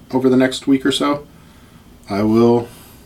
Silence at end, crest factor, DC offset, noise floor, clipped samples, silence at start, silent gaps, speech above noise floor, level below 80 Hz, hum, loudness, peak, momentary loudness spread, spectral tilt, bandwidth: 0.35 s; 14 dB; under 0.1%; -44 dBFS; under 0.1%; 0.1 s; none; 29 dB; -48 dBFS; none; -16 LUFS; -2 dBFS; 11 LU; -5.5 dB/octave; 15.5 kHz